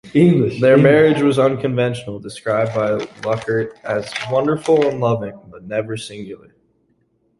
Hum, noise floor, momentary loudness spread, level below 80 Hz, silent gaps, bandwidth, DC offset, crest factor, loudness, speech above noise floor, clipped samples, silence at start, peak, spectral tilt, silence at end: none; -63 dBFS; 16 LU; -54 dBFS; none; 11.5 kHz; under 0.1%; 16 dB; -17 LUFS; 46 dB; under 0.1%; 0.05 s; -2 dBFS; -7 dB/octave; 1.05 s